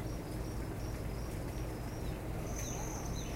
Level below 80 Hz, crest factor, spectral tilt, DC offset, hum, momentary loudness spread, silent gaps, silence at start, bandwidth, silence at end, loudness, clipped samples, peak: -44 dBFS; 12 dB; -5.5 dB/octave; under 0.1%; none; 2 LU; none; 0 s; 16 kHz; 0 s; -41 LUFS; under 0.1%; -26 dBFS